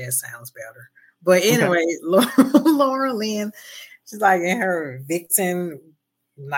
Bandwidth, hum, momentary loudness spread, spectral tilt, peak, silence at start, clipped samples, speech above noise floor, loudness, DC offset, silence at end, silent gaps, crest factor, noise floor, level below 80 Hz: 17 kHz; none; 22 LU; -4 dB/octave; -2 dBFS; 0 s; under 0.1%; 28 dB; -19 LUFS; under 0.1%; 0 s; none; 18 dB; -48 dBFS; -74 dBFS